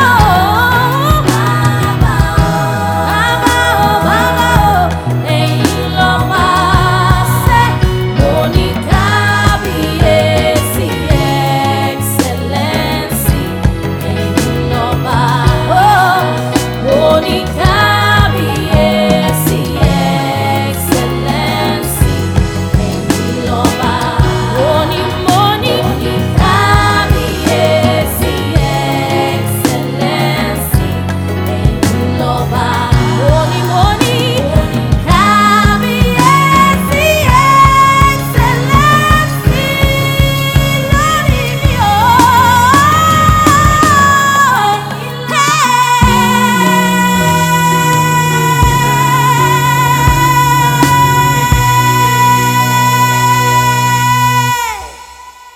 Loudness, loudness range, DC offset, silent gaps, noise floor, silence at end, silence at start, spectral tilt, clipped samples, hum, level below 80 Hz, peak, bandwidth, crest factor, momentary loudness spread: -10 LUFS; 5 LU; under 0.1%; none; -33 dBFS; 0.05 s; 0 s; -5 dB/octave; 0.9%; none; -22 dBFS; 0 dBFS; 19 kHz; 10 dB; 7 LU